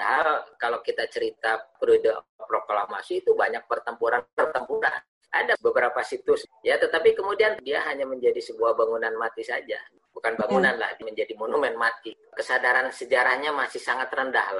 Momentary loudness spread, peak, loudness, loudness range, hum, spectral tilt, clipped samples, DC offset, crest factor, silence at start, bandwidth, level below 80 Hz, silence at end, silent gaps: 9 LU; -8 dBFS; -25 LUFS; 2 LU; none; -4 dB/octave; under 0.1%; under 0.1%; 18 dB; 0 s; 11.5 kHz; -68 dBFS; 0 s; 2.29-2.39 s, 4.33-4.37 s, 5.08-5.21 s